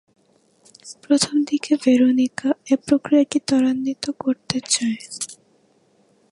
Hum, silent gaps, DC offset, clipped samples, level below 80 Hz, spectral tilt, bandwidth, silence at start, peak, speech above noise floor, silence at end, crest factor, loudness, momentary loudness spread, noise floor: none; none; under 0.1%; under 0.1%; -62 dBFS; -3.5 dB/octave; 11.5 kHz; 0.85 s; 0 dBFS; 40 dB; 1 s; 20 dB; -20 LUFS; 13 LU; -60 dBFS